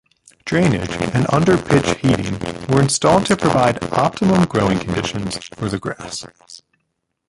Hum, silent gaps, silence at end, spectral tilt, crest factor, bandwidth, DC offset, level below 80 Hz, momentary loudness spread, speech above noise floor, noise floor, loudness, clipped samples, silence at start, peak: none; none; 0.75 s; -5.5 dB/octave; 18 dB; 11.5 kHz; under 0.1%; -42 dBFS; 12 LU; 56 dB; -73 dBFS; -17 LUFS; under 0.1%; 0.45 s; 0 dBFS